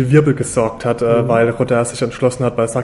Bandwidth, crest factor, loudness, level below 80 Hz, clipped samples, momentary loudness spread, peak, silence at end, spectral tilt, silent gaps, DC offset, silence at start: 11.5 kHz; 14 dB; -16 LUFS; -44 dBFS; under 0.1%; 5 LU; 0 dBFS; 0 s; -6.5 dB/octave; none; under 0.1%; 0 s